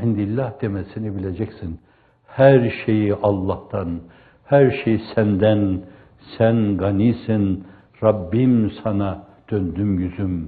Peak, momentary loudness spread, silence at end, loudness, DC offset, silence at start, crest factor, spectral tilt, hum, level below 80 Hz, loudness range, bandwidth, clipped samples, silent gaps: 0 dBFS; 13 LU; 0 s; -20 LUFS; under 0.1%; 0 s; 20 dB; -12.5 dB/octave; none; -50 dBFS; 2 LU; 4.7 kHz; under 0.1%; none